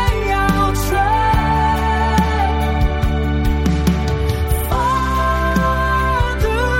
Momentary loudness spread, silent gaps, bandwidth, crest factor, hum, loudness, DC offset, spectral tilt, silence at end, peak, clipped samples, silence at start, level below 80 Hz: 3 LU; none; 16.5 kHz; 14 dB; none; -17 LUFS; under 0.1%; -6 dB/octave; 0 s; -2 dBFS; under 0.1%; 0 s; -20 dBFS